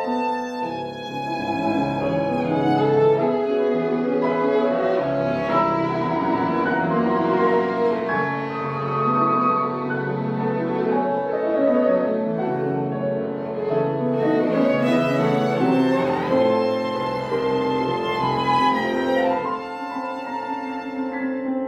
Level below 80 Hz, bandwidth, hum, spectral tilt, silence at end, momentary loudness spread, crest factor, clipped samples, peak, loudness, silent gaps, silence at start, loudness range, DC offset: -58 dBFS; 8.8 kHz; none; -7.5 dB/octave; 0 s; 8 LU; 14 dB; under 0.1%; -6 dBFS; -22 LUFS; none; 0 s; 2 LU; under 0.1%